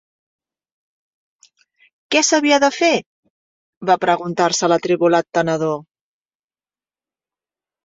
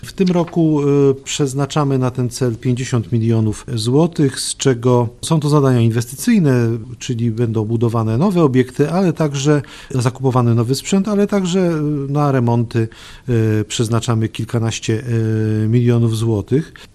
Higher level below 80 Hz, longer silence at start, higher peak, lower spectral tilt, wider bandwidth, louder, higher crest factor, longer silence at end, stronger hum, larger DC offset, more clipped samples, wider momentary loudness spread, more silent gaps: second, -66 dBFS vs -44 dBFS; first, 2.1 s vs 0.05 s; about the same, -2 dBFS vs 0 dBFS; second, -3.5 dB/octave vs -6.5 dB/octave; second, 7.8 kHz vs 13 kHz; about the same, -17 LUFS vs -17 LUFS; about the same, 18 dB vs 16 dB; first, 2 s vs 0.1 s; neither; neither; neither; about the same, 8 LU vs 6 LU; first, 3.06-3.23 s, 3.30-3.81 s vs none